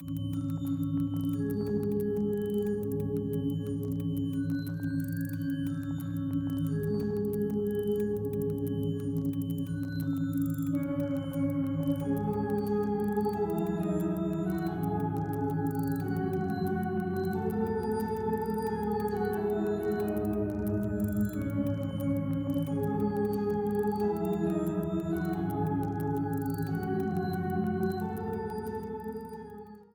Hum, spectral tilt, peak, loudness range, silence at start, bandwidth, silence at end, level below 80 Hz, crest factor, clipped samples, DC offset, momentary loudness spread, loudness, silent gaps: none; -8.5 dB/octave; -18 dBFS; 2 LU; 0 s; 19.5 kHz; 0.1 s; -52 dBFS; 12 dB; under 0.1%; under 0.1%; 3 LU; -32 LUFS; none